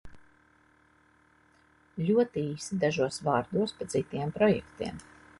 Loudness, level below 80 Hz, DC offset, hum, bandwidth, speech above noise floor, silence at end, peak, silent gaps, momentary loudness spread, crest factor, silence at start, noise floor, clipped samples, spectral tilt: -30 LUFS; -60 dBFS; under 0.1%; none; 11.5 kHz; 35 dB; 0.4 s; -12 dBFS; none; 12 LU; 20 dB; 0.05 s; -64 dBFS; under 0.1%; -6 dB/octave